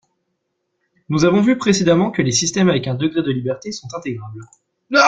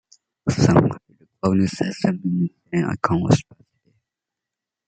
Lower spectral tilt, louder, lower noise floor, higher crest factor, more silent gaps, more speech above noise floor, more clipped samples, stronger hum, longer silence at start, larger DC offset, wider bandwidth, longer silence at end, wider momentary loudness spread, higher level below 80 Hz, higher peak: second, -4.5 dB/octave vs -7 dB/octave; first, -18 LUFS vs -21 LUFS; second, -73 dBFS vs -86 dBFS; about the same, 16 dB vs 20 dB; neither; second, 55 dB vs 66 dB; neither; neither; first, 1.1 s vs 0.45 s; neither; about the same, 9.4 kHz vs 9.2 kHz; second, 0 s vs 1.45 s; first, 14 LU vs 9 LU; about the same, -52 dBFS vs -52 dBFS; about the same, -2 dBFS vs -2 dBFS